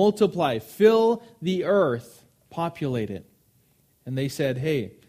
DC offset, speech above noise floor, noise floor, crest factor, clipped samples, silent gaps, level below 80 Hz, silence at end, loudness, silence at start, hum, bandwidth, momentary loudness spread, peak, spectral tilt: under 0.1%; 40 dB; -63 dBFS; 18 dB; under 0.1%; none; -62 dBFS; 0.2 s; -24 LUFS; 0 s; none; 15.5 kHz; 14 LU; -6 dBFS; -6.5 dB/octave